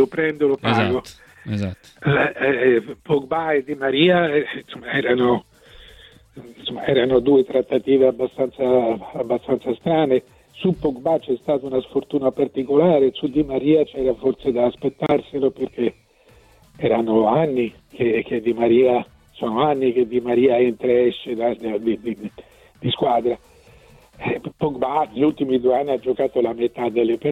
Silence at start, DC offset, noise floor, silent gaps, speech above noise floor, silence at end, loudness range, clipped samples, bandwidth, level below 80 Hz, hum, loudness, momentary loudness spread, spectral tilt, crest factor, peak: 0 s; under 0.1%; -53 dBFS; none; 33 dB; 0 s; 3 LU; under 0.1%; 8.8 kHz; -52 dBFS; none; -20 LUFS; 10 LU; -7.5 dB/octave; 16 dB; -4 dBFS